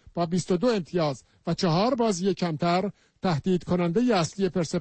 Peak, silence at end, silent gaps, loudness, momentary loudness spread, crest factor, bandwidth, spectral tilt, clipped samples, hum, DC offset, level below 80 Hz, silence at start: -14 dBFS; 0 s; none; -26 LUFS; 6 LU; 12 dB; 8.8 kHz; -6 dB/octave; under 0.1%; none; under 0.1%; -56 dBFS; 0.15 s